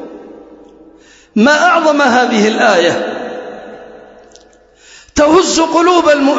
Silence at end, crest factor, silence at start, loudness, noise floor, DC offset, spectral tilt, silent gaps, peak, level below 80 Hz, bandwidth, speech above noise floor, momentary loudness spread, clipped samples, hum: 0 s; 12 dB; 0 s; -10 LUFS; -45 dBFS; under 0.1%; -3.5 dB/octave; none; 0 dBFS; -46 dBFS; 8 kHz; 35 dB; 18 LU; under 0.1%; none